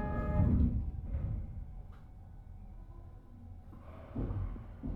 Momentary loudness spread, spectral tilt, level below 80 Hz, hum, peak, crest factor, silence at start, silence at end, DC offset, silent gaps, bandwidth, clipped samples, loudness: 23 LU; -11 dB/octave; -40 dBFS; none; -18 dBFS; 20 dB; 0 s; 0 s; under 0.1%; none; 3.6 kHz; under 0.1%; -36 LUFS